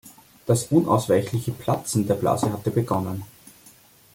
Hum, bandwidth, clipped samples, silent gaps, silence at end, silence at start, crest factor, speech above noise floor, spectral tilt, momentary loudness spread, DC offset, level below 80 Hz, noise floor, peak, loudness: none; 17 kHz; under 0.1%; none; 0.85 s; 0.05 s; 20 dB; 30 dB; -6.5 dB/octave; 11 LU; under 0.1%; -56 dBFS; -52 dBFS; -4 dBFS; -23 LUFS